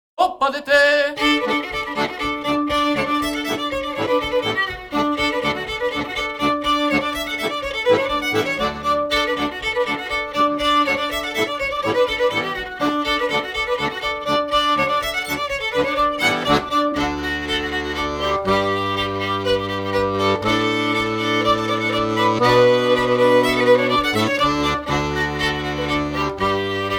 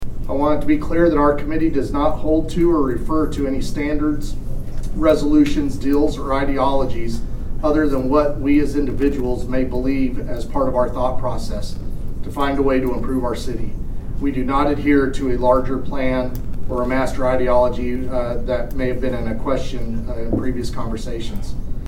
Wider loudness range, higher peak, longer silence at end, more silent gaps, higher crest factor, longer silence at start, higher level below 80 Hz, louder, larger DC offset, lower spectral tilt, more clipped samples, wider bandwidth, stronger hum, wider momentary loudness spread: about the same, 4 LU vs 4 LU; about the same, -2 dBFS vs 0 dBFS; about the same, 0 s vs 0 s; neither; about the same, 16 dB vs 16 dB; first, 0.2 s vs 0 s; second, -42 dBFS vs -26 dBFS; about the same, -19 LUFS vs -20 LUFS; neither; second, -4.5 dB/octave vs -7 dB/octave; neither; first, 19.5 kHz vs 12.5 kHz; neither; second, 7 LU vs 12 LU